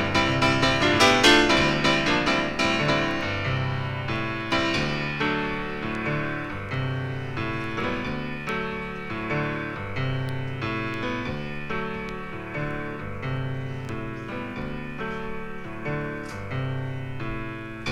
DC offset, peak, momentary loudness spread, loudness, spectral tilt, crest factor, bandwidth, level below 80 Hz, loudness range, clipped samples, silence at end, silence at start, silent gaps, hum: under 0.1%; -4 dBFS; 13 LU; -25 LUFS; -4.5 dB/octave; 22 dB; 16 kHz; -44 dBFS; 12 LU; under 0.1%; 0 s; 0 s; none; none